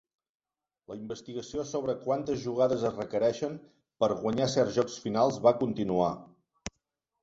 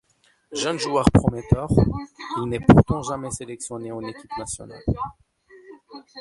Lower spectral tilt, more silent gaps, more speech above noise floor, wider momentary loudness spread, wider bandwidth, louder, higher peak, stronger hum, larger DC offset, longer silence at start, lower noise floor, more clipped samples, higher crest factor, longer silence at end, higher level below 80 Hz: about the same, -6 dB/octave vs -6.5 dB/octave; neither; first, 53 dB vs 40 dB; about the same, 18 LU vs 17 LU; second, 8 kHz vs 11.5 kHz; second, -30 LUFS vs -22 LUFS; second, -10 dBFS vs 0 dBFS; neither; neither; first, 0.9 s vs 0.5 s; first, -82 dBFS vs -61 dBFS; neither; about the same, 20 dB vs 22 dB; first, 0.55 s vs 0 s; second, -62 dBFS vs -36 dBFS